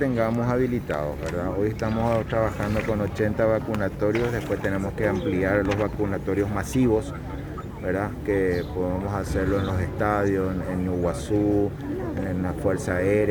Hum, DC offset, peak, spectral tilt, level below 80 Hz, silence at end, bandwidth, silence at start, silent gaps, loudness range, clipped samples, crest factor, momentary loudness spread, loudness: none; under 0.1%; -8 dBFS; -7.5 dB/octave; -38 dBFS; 0 s; over 20 kHz; 0 s; none; 1 LU; under 0.1%; 16 dB; 6 LU; -25 LUFS